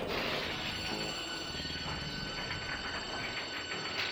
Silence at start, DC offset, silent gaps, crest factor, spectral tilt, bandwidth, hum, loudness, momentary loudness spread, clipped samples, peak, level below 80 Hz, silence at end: 0 s; under 0.1%; none; 16 dB; -3 dB/octave; over 20 kHz; none; -36 LUFS; 3 LU; under 0.1%; -22 dBFS; -54 dBFS; 0 s